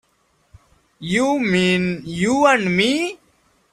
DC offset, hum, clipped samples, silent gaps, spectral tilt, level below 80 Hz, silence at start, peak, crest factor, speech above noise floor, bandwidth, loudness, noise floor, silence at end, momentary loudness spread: under 0.1%; none; under 0.1%; none; -5 dB/octave; -54 dBFS; 1 s; -2 dBFS; 18 dB; 45 dB; 13 kHz; -18 LUFS; -63 dBFS; 0.6 s; 9 LU